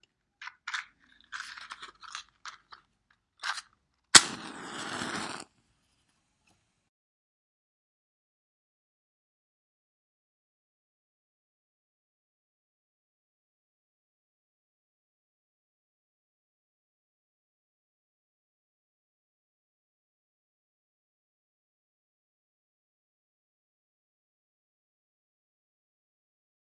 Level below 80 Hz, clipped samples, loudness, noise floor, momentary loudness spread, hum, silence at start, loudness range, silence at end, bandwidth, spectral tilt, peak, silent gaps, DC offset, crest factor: -78 dBFS; under 0.1%; -25 LUFS; -74 dBFS; 28 LU; none; 0.4 s; 16 LU; 21.3 s; 12 kHz; 0.5 dB/octave; 0 dBFS; none; under 0.1%; 40 dB